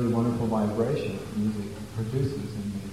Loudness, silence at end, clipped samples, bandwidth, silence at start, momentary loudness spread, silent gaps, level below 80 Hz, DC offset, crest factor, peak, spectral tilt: -29 LUFS; 0 s; under 0.1%; 15 kHz; 0 s; 8 LU; none; -50 dBFS; 0.2%; 14 dB; -14 dBFS; -7.5 dB/octave